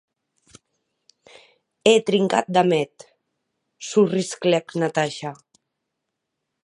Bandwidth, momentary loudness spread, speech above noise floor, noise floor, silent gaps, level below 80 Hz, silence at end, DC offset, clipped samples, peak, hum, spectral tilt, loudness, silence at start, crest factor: 11.5 kHz; 14 LU; 60 dB; -80 dBFS; none; -72 dBFS; 1.3 s; under 0.1%; under 0.1%; -2 dBFS; none; -5 dB/octave; -21 LUFS; 1.85 s; 22 dB